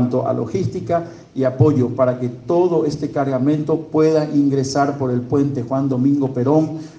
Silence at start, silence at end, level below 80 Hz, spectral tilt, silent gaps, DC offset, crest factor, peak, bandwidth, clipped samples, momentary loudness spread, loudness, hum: 0 s; 0.05 s; -54 dBFS; -8 dB/octave; none; under 0.1%; 16 dB; -2 dBFS; 8.8 kHz; under 0.1%; 6 LU; -18 LUFS; none